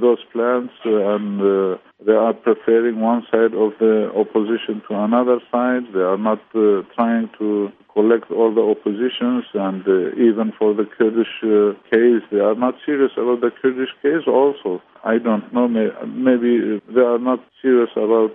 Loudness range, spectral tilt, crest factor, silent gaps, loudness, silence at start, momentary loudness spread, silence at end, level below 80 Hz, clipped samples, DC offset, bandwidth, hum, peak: 2 LU; -10.5 dB/octave; 16 dB; none; -18 LUFS; 0 s; 5 LU; 0 s; -72 dBFS; under 0.1%; under 0.1%; 3.8 kHz; none; -2 dBFS